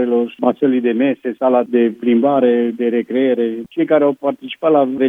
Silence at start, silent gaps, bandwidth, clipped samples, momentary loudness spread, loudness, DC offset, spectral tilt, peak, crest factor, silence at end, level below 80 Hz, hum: 0 s; none; 3.8 kHz; under 0.1%; 6 LU; -16 LUFS; under 0.1%; -8.5 dB/octave; 0 dBFS; 14 dB; 0 s; -70 dBFS; none